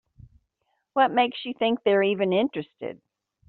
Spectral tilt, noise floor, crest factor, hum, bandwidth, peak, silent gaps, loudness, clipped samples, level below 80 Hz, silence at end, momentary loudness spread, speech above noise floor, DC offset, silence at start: -3 dB/octave; -76 dBFS; 18 dB; none; 4.5 kHz; -8 dBFS; none; -24 LUFS; under 0.1%; -66 dBFS; 0.55 s; 15 LU; 52 dB; under 0.1%; 0.95 s